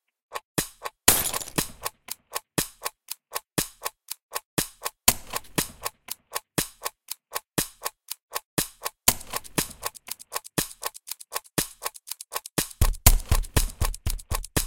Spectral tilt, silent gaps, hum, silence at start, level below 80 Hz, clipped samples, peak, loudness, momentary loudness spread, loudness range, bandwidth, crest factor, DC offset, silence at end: -2.5 dB/octave; 0.45-0.55 s, 4.22-4.29 s, 4.45-4.57 s, 8.22-8.28 s, 8.45-8.57 s; none; 0.3 s; -34 dBFS; under 0.1%; 0 dBFS; -28 LUFS; 14 LU; 5 LU; 17.5 kHz; 28 dB; under 0.1%; 0 s